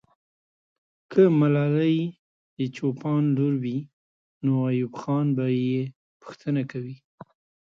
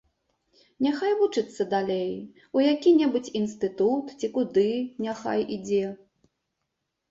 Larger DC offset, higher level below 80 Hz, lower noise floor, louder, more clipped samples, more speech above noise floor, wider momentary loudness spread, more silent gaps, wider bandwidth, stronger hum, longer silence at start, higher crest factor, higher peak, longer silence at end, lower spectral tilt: neither; about the same, -70 dBFS vs -68 dBFS; first, under -90 dBFS vs -81 dBFS; about the same, -25 LUFS vs -26 LUFS; neither; first, over 67 dB vs 56 dB; first, 15 LU vs 9 LU; first, 2.19-2.57 s, 3.93-4.41 s, 5.96-6.20 s vs none; second, 7 kHz vs 7.8 kHz; neither; first, 1.1 s vs 0.8 s; about the same, 18 dB vs 16 dB; first, -6 dBFS vs -10 dBFS; second, 0.7 s vs 1.15 s; first, -9.5 dB/octave vs -6 dB/octave